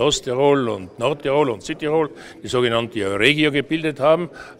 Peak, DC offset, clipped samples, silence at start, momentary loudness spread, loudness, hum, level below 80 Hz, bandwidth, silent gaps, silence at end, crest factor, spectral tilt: 0 dBFS; under 0.1%; under 0.1%; 0 s; 8 LU; -20 LUFS; none; -50 dBFS; 14.5 kHz; none; 0.05 s; 20 dB; -4.5 dB/octave